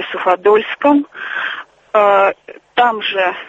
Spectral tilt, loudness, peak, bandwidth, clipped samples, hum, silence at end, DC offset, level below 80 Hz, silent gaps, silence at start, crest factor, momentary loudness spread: -5 dB/octave; -15 LUFS; 0 dBFS; 7.8 kHz; under 0.1%; none; 0 s; under 0.1%; -62 dBFS; none; 0 s; 14 dB; 11 LU